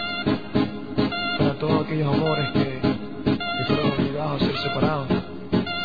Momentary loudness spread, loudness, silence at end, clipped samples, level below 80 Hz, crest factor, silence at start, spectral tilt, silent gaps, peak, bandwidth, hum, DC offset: 4 LU; -24 LUFS; 0 s; under 0.1%; -46 dBFS; 16 dB; 0 s; -8.5 dB/octave; none; -6 dBFS; 5 kHz; none; 0.9%